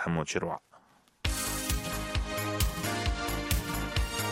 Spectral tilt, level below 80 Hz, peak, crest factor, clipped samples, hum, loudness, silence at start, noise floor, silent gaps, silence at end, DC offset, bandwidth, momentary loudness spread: -4 dB/octave; -38 dBFS; -12 dBFS; 20 dB; under 0.1%; none; -32 LUFS; 0 s; -62 dBFS; none; 0 s; under 0.1%; 16 kHz; 3 LU